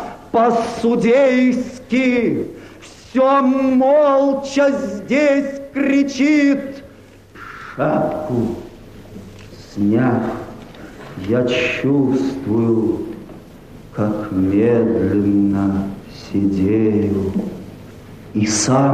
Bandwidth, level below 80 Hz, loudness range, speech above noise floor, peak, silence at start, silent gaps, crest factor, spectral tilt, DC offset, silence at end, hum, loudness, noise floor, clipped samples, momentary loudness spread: 10.5 kHz; -46 dBFS; 6 LU; 27 dB; -4 dBFS; 0 s; none; 12 dB; -6 dB/octave; under 0.1%; 0 s; none; -17 LUFS; -42 dBFS; under 0.1%; 20 LU